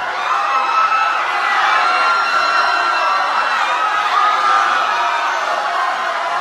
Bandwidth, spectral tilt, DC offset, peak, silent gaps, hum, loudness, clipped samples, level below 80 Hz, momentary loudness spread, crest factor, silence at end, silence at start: 13 kHz; 0 dB/octave; under 0.1%; -2 dBFS; none; none; -15 LUFS; under 0.1%; -66 dBFS; 4 LU; 12 dB; 0 s; 0 s